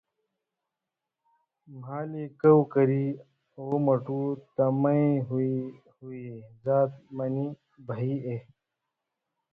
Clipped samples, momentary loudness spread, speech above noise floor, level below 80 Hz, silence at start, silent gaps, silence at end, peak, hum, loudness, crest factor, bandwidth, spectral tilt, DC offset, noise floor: under 0.1%; 19 LU; 61 dB; -70 dBFS; 1.7 s; none; 1.1 s; -8 dBFS; none; -27 LUFS; 20 dB; 3.8 kHz; -12.5 dB/octave; under 0.1%; -88 dBFS